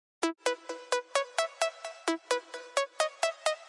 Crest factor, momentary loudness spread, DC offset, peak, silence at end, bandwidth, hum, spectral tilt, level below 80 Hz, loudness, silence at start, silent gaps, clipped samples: 22 dB; 4 LU; under 0.1%; -12 dBFS; 0 s; 11.5 kHz; none; 1 dB/octave; -86 dBFS; -32 LUFS; 0.2 s; none; under 0.1%